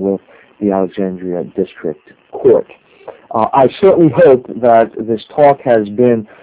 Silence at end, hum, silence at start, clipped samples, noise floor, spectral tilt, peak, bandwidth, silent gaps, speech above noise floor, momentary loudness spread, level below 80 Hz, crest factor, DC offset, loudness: 0.15 s; none; 0 s; 0.4%; -36 dBFS; -11.5 dB/octave; 0 dBFS; 4 kHz; none; 24 dB; 12 LU; -50 dBFS; 12 dB; under 0.1%; -13 LUFS